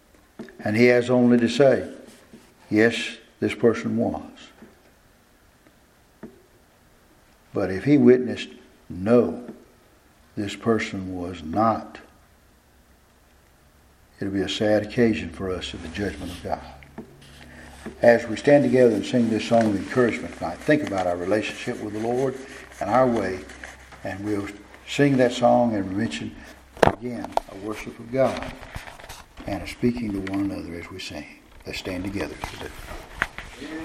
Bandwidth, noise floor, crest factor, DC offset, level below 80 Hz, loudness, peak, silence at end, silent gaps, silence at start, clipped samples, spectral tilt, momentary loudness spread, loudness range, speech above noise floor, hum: 14.5 kHz; -57 dBFS; 24 dB; under 0.1%; -50 dBFS; -23 LUFS; 0 dBFS; 0 s; none; 0.4 s; under 0.1%; -6 dB/octave; 21 LU; 9 LU; 34 dB; none